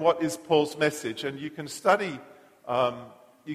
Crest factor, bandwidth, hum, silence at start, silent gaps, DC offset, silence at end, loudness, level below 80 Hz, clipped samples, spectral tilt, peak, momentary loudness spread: 20 dB; 15.5 kHz; none; 0 s; none; under 0.1%; 0 s; -27 LUFS; -72 dBFS; under 0.1%; -4.5 dB/octave; -6 dBFS; 18 LU